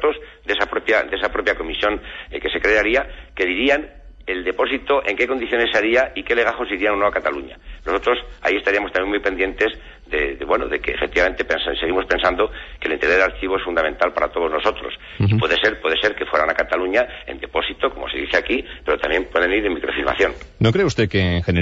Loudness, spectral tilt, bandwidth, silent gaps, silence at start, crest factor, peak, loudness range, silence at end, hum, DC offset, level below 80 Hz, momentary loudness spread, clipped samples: -20 LUFS; -6 dB/octave; 8 kHz; none; 0 s; 16 dB; -4 dBFS; 2 LU; 0 s; none; under 0.1%; -40 dBFS; 8 LU; under 0.1%